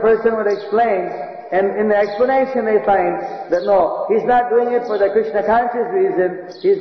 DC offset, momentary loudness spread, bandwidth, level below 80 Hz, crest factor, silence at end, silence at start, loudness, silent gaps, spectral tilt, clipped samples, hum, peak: 0.1%; 6 LU; 6.2 kHz; -52 dBFS; 12 dB; 0 s; 0 s; -17 LUFS; none; -7.5 dB/octave; under 0.1%; none; -4 dBFS